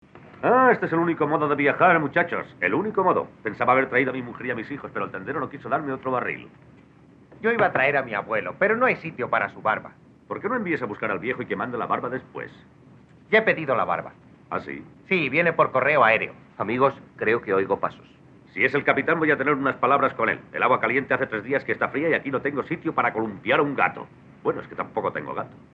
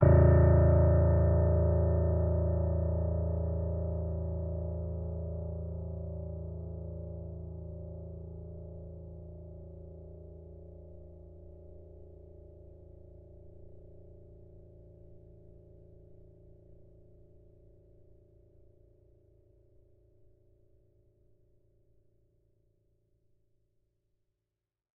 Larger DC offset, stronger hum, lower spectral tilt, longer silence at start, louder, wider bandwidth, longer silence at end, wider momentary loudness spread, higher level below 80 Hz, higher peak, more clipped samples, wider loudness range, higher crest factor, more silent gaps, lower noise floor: neither; neither; second, -8 dB/octave vs -9.5 dB/octave; first, 0.15 s vs 0 s; first, -23 LUFS vs -30 LUFS; first, 6.4 kHz vs 2.4 kHz; second, 0.15 s vs 8.15 s; second, 12 LU vs 28 LU; second, -66 dBFS vs -40 dBFS; first, -4 dBFS vs -10 dBFS; neither; second, 5 LU vs 27 LU; about the same, 20 dB vs 22 dB; neither; second, -52 dBFS vs -89 dBFS